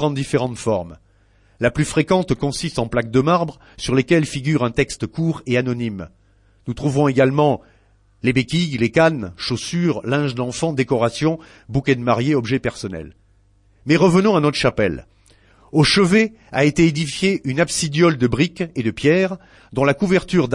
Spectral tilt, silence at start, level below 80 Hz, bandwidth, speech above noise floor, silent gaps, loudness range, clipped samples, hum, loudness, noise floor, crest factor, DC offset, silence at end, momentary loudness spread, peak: -5.5 dB/octave; 0 s; -44 dBFS; 11.5 kHz; 37 dB; none; 4 LU; under 0.1%; none; -19 LUFS; -55 dBFS; 16 dB; under 0.1%; 0 s; 10 LU; -4 dBFS